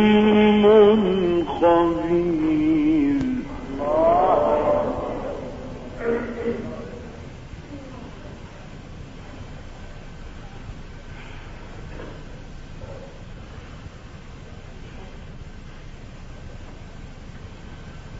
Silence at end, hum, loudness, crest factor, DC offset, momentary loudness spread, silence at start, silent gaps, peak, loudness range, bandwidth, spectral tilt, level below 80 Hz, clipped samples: 0 s; none; -20 LUFS; 20 dB; under 0.1%; 24 LU; 0 s; none; -4 dBFS; 21 LU; 7.8 kHz; -7.5 dB/octave; -40 dBFS; under 0.1%